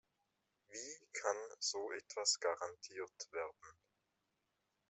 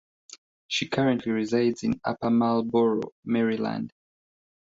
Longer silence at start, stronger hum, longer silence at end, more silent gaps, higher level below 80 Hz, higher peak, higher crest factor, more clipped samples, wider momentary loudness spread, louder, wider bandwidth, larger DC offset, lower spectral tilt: first, 0.7 s vs 0.3 s; neither; first, 1.15 s vs 0.8 s; second, none vs 0.38-0.69 s, 3.12-3.23 s; second, -90 dBFS vs -62 dBFS; second, -20 dBFS vs -12 dBFS; first, 26 dB vs 16 dB; neither; first, 13 LU vs 7 LU; second, -42 LUFS vs -26 LUFS; about the same, 8.2 kHz vs 7.8 kHz; neither; second, 0.5 dB/octave vs -6 dB/octave